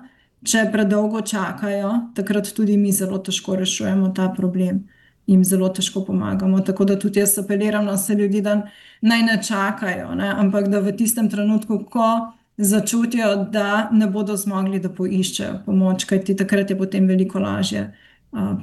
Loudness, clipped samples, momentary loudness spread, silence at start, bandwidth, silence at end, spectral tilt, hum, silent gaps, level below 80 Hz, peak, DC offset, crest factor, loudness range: -20 LUFS; under 0.1%; 6 LU; 0 s; 13 kHz; 0 s; -5 dB/octave; none; none; -60 dBFS; -6 dBFS; under 0.1%; 14 dB; 2 LU